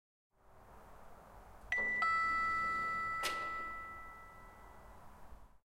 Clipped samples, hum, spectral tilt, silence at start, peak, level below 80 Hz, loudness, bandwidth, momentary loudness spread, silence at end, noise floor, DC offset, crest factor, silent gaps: under 0.1%; none; -2 dB/octave; 0.5 s; -24 dBFS; -62 dBFS; -36 LUFS; 16 kHz; 26 LU; 0.25 s; -60 dBFS; under 0.1%; 18 dB; none